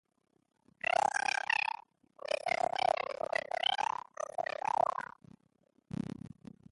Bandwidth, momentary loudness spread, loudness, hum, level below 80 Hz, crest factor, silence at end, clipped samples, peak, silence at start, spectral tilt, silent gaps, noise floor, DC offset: 11.5 kHz; 15 LU; -34 LUFS; none; -72 dBFS; 20 dB; 0.45 s; under 0.1%; -16 dBFS; 1 s; -2.5 dB/octave; none; -73 dBFS; under 0.1%